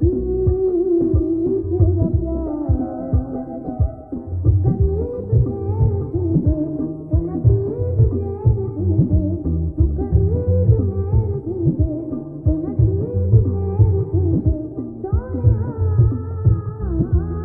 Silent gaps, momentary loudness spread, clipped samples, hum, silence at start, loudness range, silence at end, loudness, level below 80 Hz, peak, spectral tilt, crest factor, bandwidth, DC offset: none; 7 LU; under 0.1%; none; 0 s; 2 LU; 0 s; -19 LUFS; -26 dBFS; -2 dBFS; -15.5 dB/octave; 16 dB; 1.8 kHz; under 0.1%